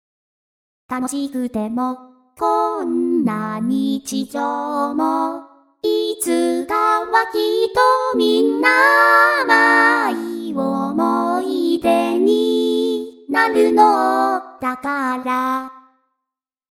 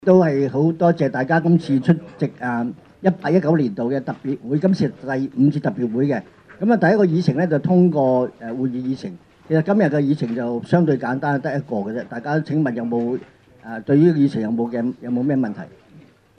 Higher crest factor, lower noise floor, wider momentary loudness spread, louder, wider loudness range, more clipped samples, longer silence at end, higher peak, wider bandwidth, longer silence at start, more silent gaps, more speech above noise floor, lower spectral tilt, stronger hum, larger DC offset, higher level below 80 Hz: about the same, 18 dB vs 16 dB; first, -83 dBFS vs -48 dBFS; about the same, 11 LU vs 11 LU; first, -17 LUFS vs -20 LUFS; first, 7 LU vs 3 LU; neither; first, 0.95 s vs 0.4 s; about the same, 0 dBFS vs -2 dBFS; first, 17.5 kHz vs 6.6 kHz; first, 0.9 s vs 0.05 s; neither; first, 66 dB vs 30 dB; second, -4 dB/octave vs -9 dB/octave; neither; neither; about the same, -60 dBFS vs -62 dBFS